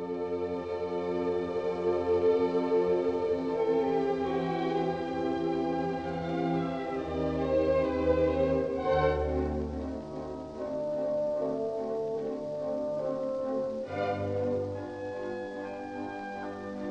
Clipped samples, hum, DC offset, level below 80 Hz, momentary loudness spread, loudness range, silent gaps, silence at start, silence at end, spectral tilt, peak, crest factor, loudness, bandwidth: under 0.1%; none; under 0.1%; -48 dBFS; 11 LU; 5 LU; none; 0 s; 0 s; -8 dB/octave; -14 dBFS; 16 dB; -31 LUFS; 8.4 kHz